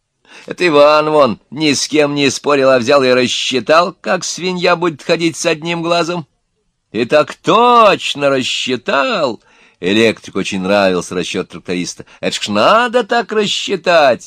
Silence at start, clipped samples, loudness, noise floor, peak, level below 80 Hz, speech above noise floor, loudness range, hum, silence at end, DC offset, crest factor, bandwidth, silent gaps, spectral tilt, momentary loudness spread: 0.35 s; 0.2%; -13 LUFS; -65 dBFS; 0 dBFS; -58 dBFS; 52 dB; 4 LU; none; 0 s; under 0.1%; 14 dB; 14.5 kHz; none; -3.5 dB/octave; 11 LU